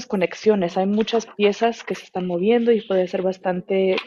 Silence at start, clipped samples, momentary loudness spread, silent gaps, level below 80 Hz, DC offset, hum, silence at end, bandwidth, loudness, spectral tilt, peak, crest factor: 0 s; under 0.1%; 8 LU; none; -62 dBFS; under 0.1%; none; 0 s; 7.4 kHz; -21 LUFS; -6 dB/octave; -4 dBFS; 16 dB